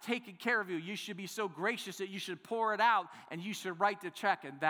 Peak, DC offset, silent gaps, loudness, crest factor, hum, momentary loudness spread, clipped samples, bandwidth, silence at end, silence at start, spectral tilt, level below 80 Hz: -16 dBFS; under 0.1%; none; -35 LUFS; 20 dB; none; 11 LU; under 0.1%; over 20 kHz; 0 s; 0 s; -3.5 dB/octave; under -90 dBFS